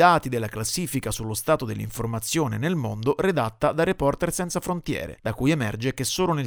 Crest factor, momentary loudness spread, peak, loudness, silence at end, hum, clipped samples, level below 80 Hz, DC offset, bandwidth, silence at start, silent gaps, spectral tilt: 20 dB; 6 LU; -4 dBFS; -25 LUFS; 0 s; none; under 0.1%; -46 dBFS; under 0.1%; over 20 kHz; 0 s; none; -5 dB/octave